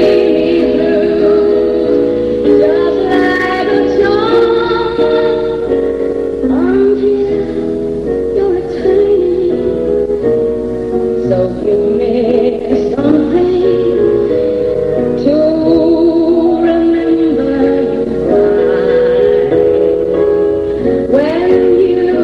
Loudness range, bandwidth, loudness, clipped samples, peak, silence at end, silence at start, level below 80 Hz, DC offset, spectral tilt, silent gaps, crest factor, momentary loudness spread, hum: 2 LU; 6.6 kHz; -11 LUFS; under 0.1%; 0 dBFS; 0 s; 0 s; -36 dBFS; 0.3%; -8 dB/octave; none; 10 dB; 5 LU; none